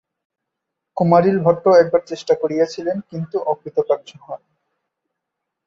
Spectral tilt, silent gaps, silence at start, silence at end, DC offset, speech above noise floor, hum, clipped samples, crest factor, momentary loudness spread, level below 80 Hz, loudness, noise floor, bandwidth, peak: -7.5 dB/octave; none; 0.95 s; 1.3 s; under 0.1%; 63 dB; none; under 0.1%; 18 dB; 20 LU; -62 dBFS; -18 LUFS; -80 dBFS; 7.6 kHz; -2 dBFS